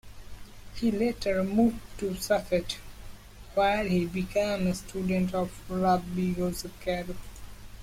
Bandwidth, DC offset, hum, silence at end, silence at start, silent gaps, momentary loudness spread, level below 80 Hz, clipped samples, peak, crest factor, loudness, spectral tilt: 16.5 kHz; under 0.1%; none; 0 s; 0.05 s; none; 22 LU; -46 dBFS; under 0.1%; -14 dBFS; 16 dB; -29 LUFS; -6 dB/octave